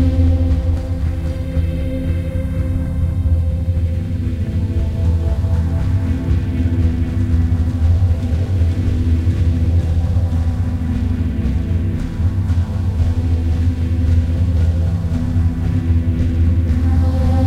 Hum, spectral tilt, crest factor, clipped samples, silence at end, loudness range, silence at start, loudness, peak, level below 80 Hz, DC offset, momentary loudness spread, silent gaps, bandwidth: none; -9 dB/octave; 12 dB; under 0.1%; 0 s; 3 LU; 0 s; -18 LUFS; -4 dBFS; -20 dBFS; under 0.1%; 5 LU; none; 5.8 kHz